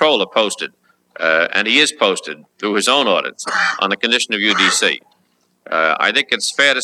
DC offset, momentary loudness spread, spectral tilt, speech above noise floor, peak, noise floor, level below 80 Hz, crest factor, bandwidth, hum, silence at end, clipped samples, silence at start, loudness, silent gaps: under 0.1%; 10 LU; -1.5 dB/octave; 45 dB; 0 dBFS; -62 dBFS; -76 dBFS; 16 dB; 14.5 kHz; none; 0 s; under 0.1%; 0 s; -15 LUFS; none